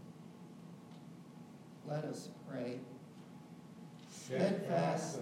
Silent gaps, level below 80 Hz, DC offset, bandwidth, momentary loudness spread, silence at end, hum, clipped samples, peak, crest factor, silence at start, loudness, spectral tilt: none; -86 dBFS; under 0.1%; 15.5 kHz; 20 LU; 0 s; none; under 0.1%; -20 dBFS; 22 dB; 0 s; -39 LUFS; -6 dB/octave